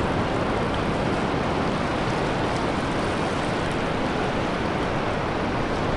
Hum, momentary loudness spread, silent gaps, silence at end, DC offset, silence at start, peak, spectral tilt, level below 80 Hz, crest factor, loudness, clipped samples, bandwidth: none; 1 LU; none; 0 s; under 0.1%; 0 s; -12 dBFS; -6 dB/octave; -38 dBFS; 12 dB; -25 LUFS; under 0.1%; 11.5 kHz